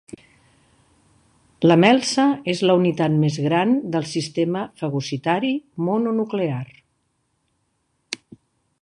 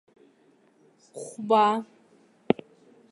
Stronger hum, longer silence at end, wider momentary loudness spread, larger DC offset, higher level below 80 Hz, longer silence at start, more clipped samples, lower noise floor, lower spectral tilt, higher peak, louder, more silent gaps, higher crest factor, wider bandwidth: neither; about the same, 0.65 s vs 0.6 s; second, 12 LU vs 23 LU; neither; first, -64 dBFS vs -70 dBFS; first, 1.6 s vs 1.15 s; neither; first, -70 dBFS vs -62 dBFS; about the same, -6 dB/octave vs -5.5 dB/octave; about the same, -2 dBFS vs -4 dBFS; first, -20 LUFS vs -25 LUFS; neither; second, 20 dB vs 26 dB; about the same, 11 kHz vs 11.5 kHz